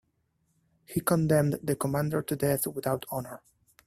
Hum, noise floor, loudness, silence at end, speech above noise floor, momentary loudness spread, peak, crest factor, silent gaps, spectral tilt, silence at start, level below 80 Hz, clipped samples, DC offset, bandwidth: none; -74 dBFS; -29 LUFS; 0.5 s; 46 dB; 12 LU; -10 dBFS; 20 dB; none; -6 dB/octave; 0.9 s; -60 dBFS; under 0.1%; under 0.1%; 16 kHz